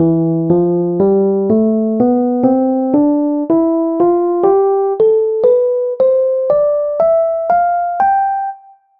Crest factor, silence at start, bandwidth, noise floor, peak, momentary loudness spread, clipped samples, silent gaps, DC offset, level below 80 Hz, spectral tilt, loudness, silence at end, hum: 12 dB; 0 s; 3.7 kHz; -33 dBFS; -2 dBFS; 3 LU; under 0.1%; none; under 0.1%; -52 dBFS; -12.5 dB/octave; -13 LUFS; 0.4 s; none